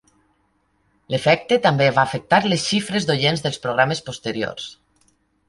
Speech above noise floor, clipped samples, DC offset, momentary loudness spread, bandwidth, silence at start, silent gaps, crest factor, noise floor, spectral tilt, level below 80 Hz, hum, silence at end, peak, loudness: 46 dB; under 0.1%; under 0.1%; 10 LU; 11.5 kHz; 1.1 s; none; 20 dB; -65 dBFS; -4.5 dB/octave; -56 dBFS; none; 0.75 s; -2 dBFS; -19 LUFS